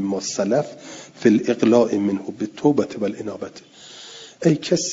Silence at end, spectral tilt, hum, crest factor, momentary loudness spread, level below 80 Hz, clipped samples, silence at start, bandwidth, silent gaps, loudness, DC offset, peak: 0 s; -5.5 dB/octave; none; 18 dB; 21 LU; -64 dBFS; under 0.1%; 0 s; 7.8 kHz; none; -20 LUFS; under 0.1%; -2 dBFS